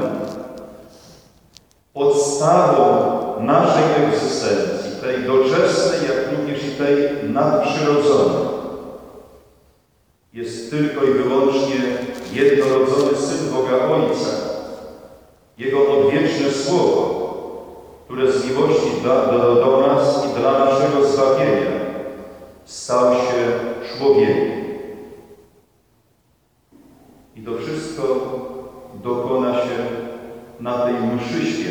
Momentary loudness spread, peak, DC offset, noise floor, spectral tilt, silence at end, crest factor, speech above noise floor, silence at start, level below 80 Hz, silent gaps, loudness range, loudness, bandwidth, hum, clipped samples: 17 LU; -2 dBFS; under 0.1%; -61 dBFS; -5.5 dB/octave; 0 s; 18 dB; 45 dB; 0 s; -56 dBFS; none; 8 LU; -18 LUFS; 11.5 kHz; none; under 0.1%